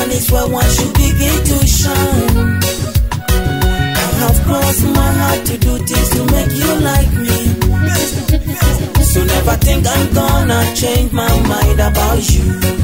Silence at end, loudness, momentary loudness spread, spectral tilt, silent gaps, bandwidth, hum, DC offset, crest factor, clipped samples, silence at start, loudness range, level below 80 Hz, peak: 0 s; -13 LUFS; 3 LU; -4.5 dB/octave; none; 16.5 kHz; none; 0.7%; 12 dB; under 0.1%; 0 s; 1 LU; -16 dBFS; 0 dBFS